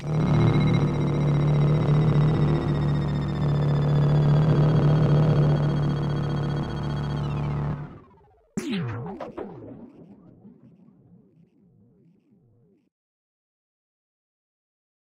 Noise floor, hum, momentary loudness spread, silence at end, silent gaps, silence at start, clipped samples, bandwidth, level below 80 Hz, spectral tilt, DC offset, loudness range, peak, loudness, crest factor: -61 dBFS; none; 15 LU; 4.5 s; none; 0 s; under 0.1%; 7.4 kHz; -40 dBFS; -9 dB/octave; under 0.1%; 15 LU; -8 dBFS; -23 LUFS; 16 dB